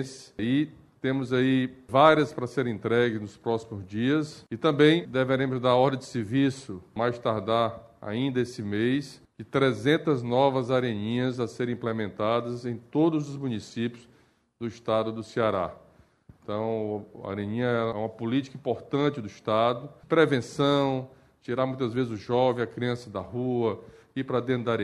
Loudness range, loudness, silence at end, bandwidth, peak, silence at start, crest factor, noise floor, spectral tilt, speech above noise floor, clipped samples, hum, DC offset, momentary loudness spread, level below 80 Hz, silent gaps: 6 LU; -27 LUFS; 0 s; 12 kHz; -4 dBFS; 0 s; 22 dB; -56 dBFS; -7 dB/octave; 30 dB; under 0.1%; none; under 0.1%; 12 LU; -64 dBFS; none